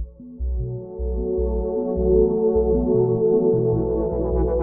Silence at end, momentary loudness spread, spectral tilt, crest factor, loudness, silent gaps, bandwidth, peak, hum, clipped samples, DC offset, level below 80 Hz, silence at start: 0 s; 11 LU; -11.5 dB/octave; 14 dB; -21 LUFS; none; 1.8 kHz; -6 dBFS; none; under 0.1%; under 0.1%; -28 dBFS; 0 s